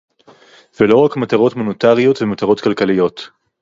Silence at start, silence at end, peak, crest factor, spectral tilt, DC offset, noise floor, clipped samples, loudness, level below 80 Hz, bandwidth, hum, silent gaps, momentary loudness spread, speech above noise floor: 0.8 s; 0.35 s; 0 dBFS; 14 dB; -7 dB/octave; under 0.1%; -46 dBFS; under 0.1%; -14 LUFS; -54 dBFS; 7.6 kHz; none; none; 6 LU; 32 dB